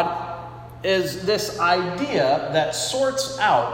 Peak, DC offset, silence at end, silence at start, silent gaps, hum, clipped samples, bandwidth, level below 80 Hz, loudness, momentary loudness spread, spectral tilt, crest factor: -6 dBFS; under 0.1%; 0 s; 0 s; none; 60 Hz at -45 dBFS; under 0.1%; 16.5 kHz; -54 dBFS; -22 LUFS; 10 LU; -3.5 dB/octave; 16 dB